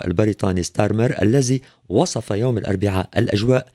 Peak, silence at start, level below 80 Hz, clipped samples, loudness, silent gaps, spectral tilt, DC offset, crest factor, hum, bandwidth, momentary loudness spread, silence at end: -2 dBFS; 0 s; -46 dBFS; under 0.1%; -20 LUFS; none; -6 dB/octave; under 0.1%; 16 dB; none; 13 kHz; 4 LU; 0.1 s